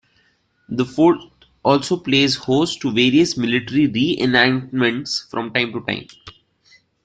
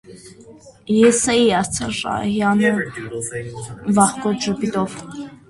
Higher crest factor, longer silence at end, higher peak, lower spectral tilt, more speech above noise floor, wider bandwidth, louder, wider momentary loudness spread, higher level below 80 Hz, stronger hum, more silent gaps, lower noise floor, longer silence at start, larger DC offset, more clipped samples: about the same, 18 dB vs 20 dB; first, 0.75 s vs 0.15 s; about the same, -2 dBFS vs 0 dBFS; about the same, -5 dB/octave vs -4 dB/octave; first, 44 dB vs 25 dB; second, 9.2 kHz vs 11.5 kHz; about the same, -18 LUFS vs -19 LUFS; second, 9 LU vs 13 LU; second, -56 dBFS vs -50 dBFS; neither; neither; first, -62 dBFS vs -44 dBFS; first, 0.7 s vs 0.1 s; neither; neither